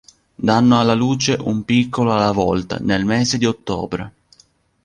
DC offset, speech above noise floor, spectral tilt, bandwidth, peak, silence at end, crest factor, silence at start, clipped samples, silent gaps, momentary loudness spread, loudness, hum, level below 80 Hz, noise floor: under 0.1%; 39 dB; -5.5 dB/octave; 9.8 kHz; -2 dBFS; 0.75 s; 16 dB; 0.4 s; under 0.1%; none; 10 LU; -17 LUFS; none; -44 dBFS; -56 dBFS